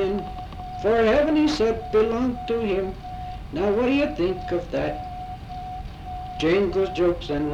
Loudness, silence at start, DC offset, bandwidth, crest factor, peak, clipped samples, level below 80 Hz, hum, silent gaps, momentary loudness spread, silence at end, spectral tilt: -23 LUFS; 0 s; under 0.1%; 11 kHz; 14 dB; -10 dBFS; under 0.1%; -40 dBFS; none; none; 15 LU; 0 s; -6.5 dB/octave